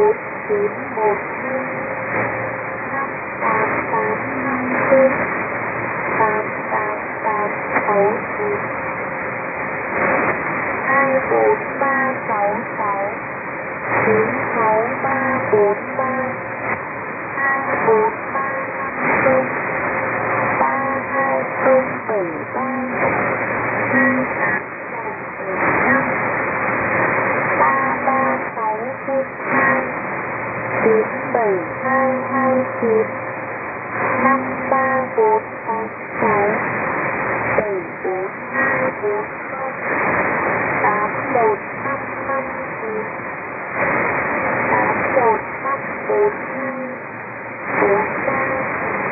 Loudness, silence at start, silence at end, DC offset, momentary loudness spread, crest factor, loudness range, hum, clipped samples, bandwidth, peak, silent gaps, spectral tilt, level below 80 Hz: -19 LUFS; 0 s; 0 s; under 0.1%; 8 LU; 18 dB; 3 LU; none; under 0.1%; 2.8 kHz; -2 dBFS; none; -12.5 dB/octave; -56 dBFS